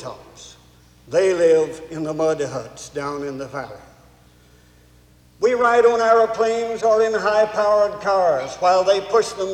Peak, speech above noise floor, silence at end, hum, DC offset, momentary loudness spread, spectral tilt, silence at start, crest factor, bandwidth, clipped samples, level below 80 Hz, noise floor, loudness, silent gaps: -4 dBFS; 33 dB; 0 s; none; under 0.1%; 14 LU; -4 dB/octave; 0 s; 16 dB; 11.5 kHz; under 0.1%; -56 dBFS; -52 dBFS; -19 LUFS; none